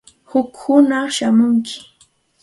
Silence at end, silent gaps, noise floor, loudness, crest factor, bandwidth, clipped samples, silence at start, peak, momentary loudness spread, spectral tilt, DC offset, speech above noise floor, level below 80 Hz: 0.65 s; none; -56 dBFS; -16 LUFS; 16 dB; 11.5 kHz; under 0.1%; 0.35 s; 0 dBFS; 10 LU; -4.5 dB/octave; under 0.1%; 41 dB; -62 dBFS